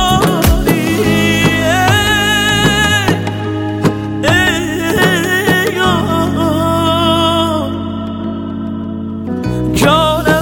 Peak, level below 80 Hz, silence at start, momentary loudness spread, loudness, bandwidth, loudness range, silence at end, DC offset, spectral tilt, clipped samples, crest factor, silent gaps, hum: 0 dBFS; -28 dBFS; 0 s; 10 LU; -13 LUFS; 17 kHz; 4 LU; 0 s; under 0.1%; -4.5 dB/octave; under 0.1%; 12 dB; none; none